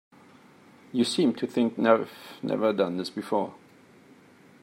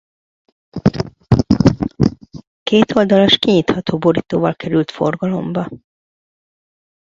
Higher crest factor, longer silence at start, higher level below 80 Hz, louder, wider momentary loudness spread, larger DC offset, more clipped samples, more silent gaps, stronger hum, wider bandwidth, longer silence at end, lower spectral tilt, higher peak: first, 22 dB vs 16 dB; first, 0.95 s vs 0.75 s; second, -78 dBFS vs -38 dBFS; second, -27 LUFS vs -16 LUFS; about the same, 11 LU vs 11 LU; neither; neither; second, none vs 2.47-2.66 s; neither; first, 16 kHz vs 7.6 kHz; second, 1.05 s vs 1.25 s; second, -5.5 dB/octave vs -7 dB/octave; second, -6 dBFS vs 0 dBFS